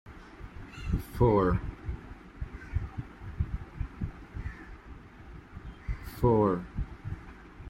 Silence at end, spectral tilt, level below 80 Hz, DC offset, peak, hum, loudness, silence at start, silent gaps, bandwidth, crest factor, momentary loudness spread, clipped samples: 0 s; -9 dB/octave; -40 dBFS; under 0.1%; -14 dBFS; none; -32 LUFS; 0.05 s; none; 16 kHz; 20 dB; 23 LU; under 0.1%